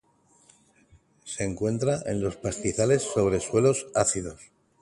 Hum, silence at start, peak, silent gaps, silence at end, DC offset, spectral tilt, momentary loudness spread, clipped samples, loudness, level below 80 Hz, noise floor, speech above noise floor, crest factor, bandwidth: none; 1.25 s; -8 dBFS; none; 0.35 s; under 0.1%; -5 dB/octave; 9 LU; under 0.1%; -26 LUFS; -52 dBFS; -60 dBFS; 35 dB; 20 dB; 11.5 kHz